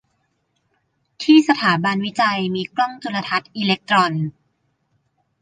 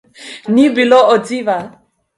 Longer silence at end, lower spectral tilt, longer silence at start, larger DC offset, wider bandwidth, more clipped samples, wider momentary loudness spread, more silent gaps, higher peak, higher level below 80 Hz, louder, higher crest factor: first, 1.1 s vs 0.5 s; about the same, -5.5 dB/octave vs -5 dB/octave; first, 1.2 s vs 0.2 s; neither; second, 9.4 kHz vs 11.5 kHz; neither; second, 11 LU vs 20 LU; neither; about the same, -2 dBFS vs 0 dBFS; second, -66 dBFS vs -60 dBFS; second, -18 LUFS vs -12 LUFS; about the same, 18 dB vs 14 dB